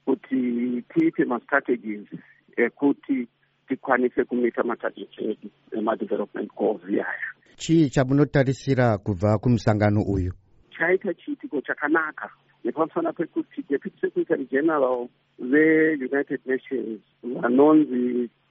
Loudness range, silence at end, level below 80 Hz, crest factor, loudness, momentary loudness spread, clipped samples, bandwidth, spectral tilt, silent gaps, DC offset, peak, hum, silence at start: 5 LU; 0.25 s; -52 dBFS; 20 dB; -24 LUFS; 13 LU; under 0.1%; 8 kHz; -6.5 dB/octave; none; under 0.1%; -4 dBFS; none; 0.05 s